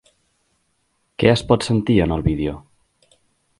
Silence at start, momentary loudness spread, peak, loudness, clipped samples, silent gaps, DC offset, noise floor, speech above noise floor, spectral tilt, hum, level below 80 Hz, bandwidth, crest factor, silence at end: 1.2 s; 14 LU; 0 dBFS; -19 LUFS; under 0.1%; none; under 0.1%; -68 dBFS; 50 dB; -6.5 dB/octave; none; -36 dBFS; 11.5 kHz; 22 dB; 1 s